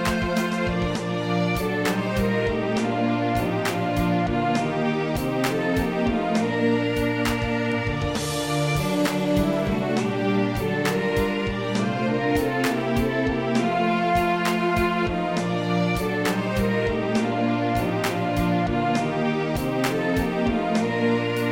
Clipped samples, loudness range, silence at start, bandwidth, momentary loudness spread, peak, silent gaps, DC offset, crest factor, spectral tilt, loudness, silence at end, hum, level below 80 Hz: under 0.1%; 1 LU; 0 s; 17 kHz; 3 LU; -8 dBFS; none; 0.1%; 14 dB; -6 dB/octave; -23 LUFS; 0 s; none; -40 dBFS